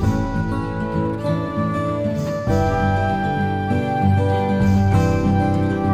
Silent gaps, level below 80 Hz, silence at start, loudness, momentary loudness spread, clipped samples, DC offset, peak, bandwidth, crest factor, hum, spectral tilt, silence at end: none; -34 dBFS; 0 s; -20 LUFS; 6 LU; under 0.1%; under 0.1%; -6 dBFS; 9.2 kHz; 14 dB; none; -8 dB/octave; 0 s